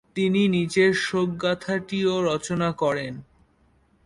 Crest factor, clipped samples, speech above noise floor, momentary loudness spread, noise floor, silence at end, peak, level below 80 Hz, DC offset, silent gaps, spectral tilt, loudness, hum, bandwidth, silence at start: 16 dB; under 0.1%; 39 dB; 7 LU; -62 dBFS; 0.8 s; -8 dBFS; -58 dBFS; under 0.1%; none; -5.5 dB/octave; -23 LUFS; none; 11.5 kHz; 0.15 s